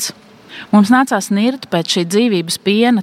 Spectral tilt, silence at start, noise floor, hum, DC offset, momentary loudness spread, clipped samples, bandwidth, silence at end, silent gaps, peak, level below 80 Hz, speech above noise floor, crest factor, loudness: -4.5 dB/octave; 0 s; -37 dBFS; none; under 0.1%; 10 LU; under 0.1%; 16 kHz; 0 s; none; 0 dBFS; -64 dBFS; 24 dB; 14 dB; -14 LUFS